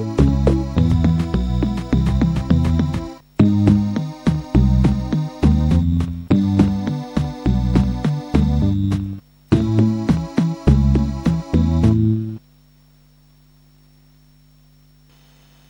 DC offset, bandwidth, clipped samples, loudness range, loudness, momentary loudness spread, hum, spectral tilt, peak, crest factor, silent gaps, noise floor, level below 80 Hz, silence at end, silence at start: under 0.1%; 16.5 kHz; under 0.1%; 3 LU; -18 LUFS; 7 LU; none; -8.5 dB/octave; -2 dBFS; 16 dB; none; -51 dBFS; -26 dBFS; 3.3 s; 0 s